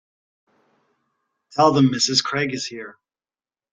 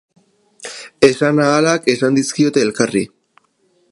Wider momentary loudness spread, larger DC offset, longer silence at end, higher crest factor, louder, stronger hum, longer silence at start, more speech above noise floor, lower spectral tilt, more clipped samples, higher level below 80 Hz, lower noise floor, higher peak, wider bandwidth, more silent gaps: about the same, 17 LU vs 18 LU; neither; about the same, 0.8 s vs 0.85 s; first, 22 dB vs 16 dB; second, -19 LUFS vs -15 LUFS; neither; first, 1.5 s vs 0.65 s; first, over 70 dB vs 46 dB; about the same, -4 dB/octave vs -4.5 dB/octave; neither; about the same, -64 dBFS vs -60 dBFS; first, under -90 dBFS vs -60 dBFS; about the same, -2 dBFS vs 0 dBFS; second, 9.4 kHz vs 11.5 kHz; neither